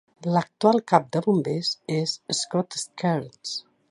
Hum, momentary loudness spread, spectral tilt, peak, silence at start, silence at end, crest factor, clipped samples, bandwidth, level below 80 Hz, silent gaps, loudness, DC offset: none; 10 LU; -5 dB/octave; -2 dBFS; 0.2 s; 0.3 s; 24 dB; under 0.1%; 11.5 kHz; -72 dBFS; none; -25 LUFS; under 0.1%